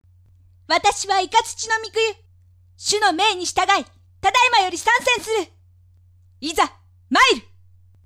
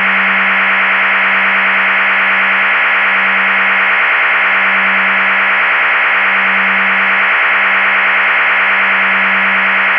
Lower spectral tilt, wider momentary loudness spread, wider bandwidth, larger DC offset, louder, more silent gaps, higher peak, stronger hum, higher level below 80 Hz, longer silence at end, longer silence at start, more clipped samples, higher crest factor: second, -1 dB/octave vs -5 dB/octave; first, 10 LU vs 0 LU; first, 16 kHz vs 5.4 kHz; neither; second, -19 LUFS vs -9 LUFS; neither; about the same, -4 dBFS vs -4 dBFS; neither; first, -54 dBFS vs -62 dBFS; first, 0.65 s vs 0 s; first, 0.7 s vs 0 s; neither; first, 18 dB vs 8 dB